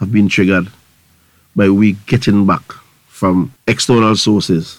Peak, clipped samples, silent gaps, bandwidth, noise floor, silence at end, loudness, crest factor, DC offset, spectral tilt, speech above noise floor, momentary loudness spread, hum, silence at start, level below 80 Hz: 0 dBFS; under 0.1%; none; 13.5 kHz; -52 dBFS; 0.05 s; -13 LUFS; 14 dB; under 0.1%; -5.5 dB/octave; 40 dB; 7 LU; none; 0 s; -44 dBFS